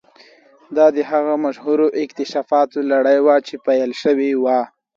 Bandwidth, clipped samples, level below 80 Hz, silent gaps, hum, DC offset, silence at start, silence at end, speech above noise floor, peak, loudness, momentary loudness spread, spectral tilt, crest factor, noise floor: 7.4 kHz; under 0.1%; -70 dBFS; none; none; under 0.1%; 0.7 s; 0.3 s; 32 dB; -2 dBFS; -17 LUFS; 7 LU; -5.5 dB/octave; 16 dB; -49 dBFS